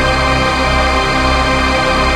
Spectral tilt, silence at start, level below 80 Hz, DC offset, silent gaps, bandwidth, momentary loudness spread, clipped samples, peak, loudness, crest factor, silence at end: -4.5 dB/octave; 0 s; -20 dBFS; under 0.1%; none; 13.5 kHz; 0 LU; under 0.1%; -2 dBFS; -12 LUFS; 12 dB; 0 s